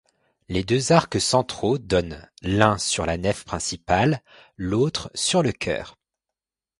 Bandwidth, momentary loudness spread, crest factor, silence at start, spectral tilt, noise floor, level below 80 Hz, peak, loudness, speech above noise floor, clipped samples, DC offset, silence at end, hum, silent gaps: 11.5 kHz; 11 LU; 24 dB; 0.5 s; -4.5 dB/octave; -88 dBFS; -44 dBFS; 0 dBFS; -23 LUFS; 65 dB; under 0.1%; under 0.1%; 0.9 s; none; none